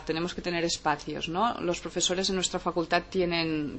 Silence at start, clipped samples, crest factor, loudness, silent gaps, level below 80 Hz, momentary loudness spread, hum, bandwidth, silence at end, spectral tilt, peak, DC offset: 0 s; under 0.1%; 20 dB; -28 LUFS; none; -52 dBFS; 5 LU; none; 8.6 kHz; 0 s; -3.5 dB/octave; -8 dBFS; under 0.1%